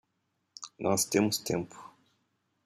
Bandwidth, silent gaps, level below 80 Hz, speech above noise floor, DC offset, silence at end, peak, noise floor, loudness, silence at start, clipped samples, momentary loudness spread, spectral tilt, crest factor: 15 kHz; none; -70 dBFS; 49 dB; under 0.1%; 0.8 s; -12 dBFS; -79 dBFS; -30 LUFS; 0.6 s; under 0.1%; 19 LU; -3.5 dB/octave; 22 dB